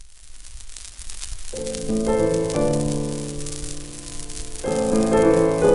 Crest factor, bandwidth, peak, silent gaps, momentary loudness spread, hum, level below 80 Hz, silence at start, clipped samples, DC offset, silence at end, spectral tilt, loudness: 18 dB; 12 kHz; -4 dBFS; none; 19 LU; none; -36 dBFS; 0 s; under 0.1%; under 0.1%; 0 s; -5.5 dB/octave; -22 LUFS